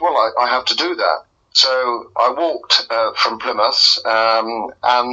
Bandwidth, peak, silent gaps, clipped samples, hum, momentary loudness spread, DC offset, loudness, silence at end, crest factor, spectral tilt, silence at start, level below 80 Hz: 8.2 kHz; 0 dBFS; none; under 0.1%; none; 8 LU; under 0.1%; -15 LUFS; 0 s; 16 dB; -0.5 dB/octave; 0 s; -62 dBFS